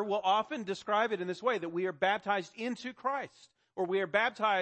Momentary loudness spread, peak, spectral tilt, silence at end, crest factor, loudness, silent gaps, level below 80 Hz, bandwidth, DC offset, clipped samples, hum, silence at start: 9 LU; -14 dBFS; -4.5 dB/octave; 0 s; 18 dB; -32 LUFS; none; -80 dBFS; 8.4 kHz; under 0.1%; under 0.1%; none; 0 s